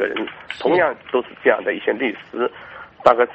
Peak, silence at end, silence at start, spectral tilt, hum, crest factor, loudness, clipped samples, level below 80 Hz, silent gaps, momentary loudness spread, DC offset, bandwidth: 0 dBFS; 0 s; 0 s; -6 dB/octave; none; 20 dB; -20 LUFS; under 0.1%; -58 dBFS; none; 10 LU; under 0.1%; 8.2 kHz